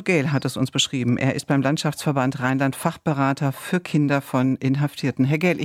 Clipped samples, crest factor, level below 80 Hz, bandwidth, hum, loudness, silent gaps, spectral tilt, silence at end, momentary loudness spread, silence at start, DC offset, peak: under 0.1%; 16 dB; -60 dBFS; 15.5 kHz; none; -22 LUFS; none; -5.5 dB/octave; 0 s; 3 LU; 0 s; under 0.1%; -6 dBFS